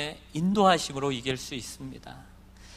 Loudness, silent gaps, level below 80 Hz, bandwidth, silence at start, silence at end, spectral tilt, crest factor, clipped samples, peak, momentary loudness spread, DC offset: -27 LUFS; none; -54 dBFS; 15.5 kHz; 0 s; 0 s; -4.5 dB/octave; 20 dB; under 0.1%; -8 dBFS; 20 LU; under 0.1%